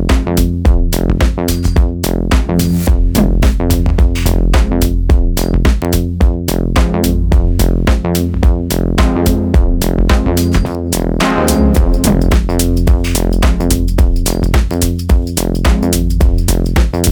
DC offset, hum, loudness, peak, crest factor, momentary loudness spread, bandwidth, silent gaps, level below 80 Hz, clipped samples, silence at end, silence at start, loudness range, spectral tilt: under 0.1%; none; -13 LUFS; 0 dBFS; 10 dB; 3 LU; 20 kHz; none; -12 dBFS; under 0.1%; 0 s; 0 s; 1 LU; -6 dB/octave